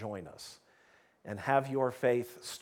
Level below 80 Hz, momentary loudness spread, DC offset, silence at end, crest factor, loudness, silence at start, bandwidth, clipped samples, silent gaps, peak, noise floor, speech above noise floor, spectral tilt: -76 dBFS; 19 LU; under 0.1%; 0 s; 20 dB; -33 LUFS; 0 s; 18.5 kHz; under 0.1%; none; -14 dBFS; -66 dBFS; 32 dB; -5.5 dB/octave